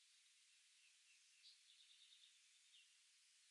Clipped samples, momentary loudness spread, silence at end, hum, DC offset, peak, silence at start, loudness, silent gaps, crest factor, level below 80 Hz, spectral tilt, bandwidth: under 0.1%; 3 LU; 0 s; none; under 0.1%; -54 dBFS; 0 s; -68 LUFS; none; 18 dB; under -90 dBFS; 5 dB/octave; 11 kHz